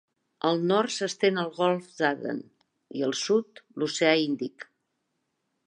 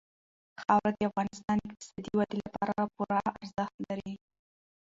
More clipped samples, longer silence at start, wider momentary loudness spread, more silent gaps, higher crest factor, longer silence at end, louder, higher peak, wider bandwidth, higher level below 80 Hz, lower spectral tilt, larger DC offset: neither; second, 0.45 s vs 0.6 s; about the same, 14 LU vs 12 LU; second, none vs 3.74-3.78 s; about the same, 20 dB vs 22 dB; first, 1.05 s vs 0.7 s; first, -27 LUFS vs -32 LUFS; first, -8 dBFS vs -12 dBFS; first, 10.5 kHz vs 7.8 kHz; second, -82 dBFS vs -64 dBFS; second, -4 dB/octave vs -6.5 dB/octave; neither